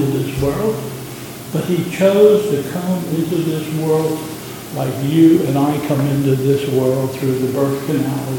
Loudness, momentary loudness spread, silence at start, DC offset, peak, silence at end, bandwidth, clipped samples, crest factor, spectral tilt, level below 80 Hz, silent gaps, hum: -17 LUFS; 13 LU; 0 s; under 0.1%; 0 dBFS; 0 s; 17.5 kHz; under 0.1%; 16 dB; -7 dB/octave; -46 dBFS; none; none